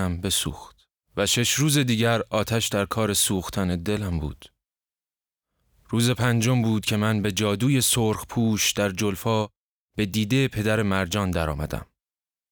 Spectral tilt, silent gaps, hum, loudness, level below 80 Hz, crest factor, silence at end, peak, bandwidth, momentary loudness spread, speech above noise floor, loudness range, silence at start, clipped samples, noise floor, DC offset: -4 dB/octave; 9.57-9.88 s; none; -23 LUFS; -44 dBFS; 18 dB; 0.7 s; -6 dBFS; over 20 kHz; 9 LU; over 67 dB; 4 LU; 0 s; under 0.1%; under -90 dBFS; under 0.1%